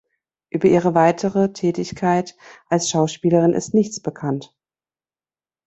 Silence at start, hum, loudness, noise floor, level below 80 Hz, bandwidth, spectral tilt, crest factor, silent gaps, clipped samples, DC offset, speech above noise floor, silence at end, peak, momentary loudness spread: 0.55 s; none; -19 LUFS; under -90 dBFS; -58 dBFS; 8.2 kHz; -6 dB/octave; 18 dB; none; under 0.1%; under 0.1%; over 71 dB; 1.2 s; -2 dBFS; 10 LU